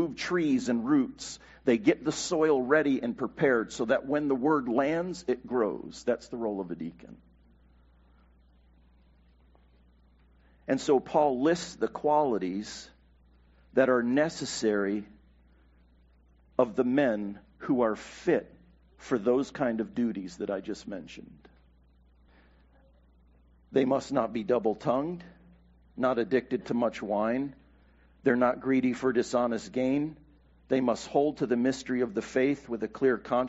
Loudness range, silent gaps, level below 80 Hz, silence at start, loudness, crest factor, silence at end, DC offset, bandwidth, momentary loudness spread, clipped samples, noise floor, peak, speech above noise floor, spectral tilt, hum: 8 LU; none; -60 dBFS; 0 s; -29 LUFS; 20 dB; 0 s; under 0.1%; 8 kHz; 11 LU; under 0.1%; -61 dBFS; -10 dBFS; 33 dB; -5 dB/octave; none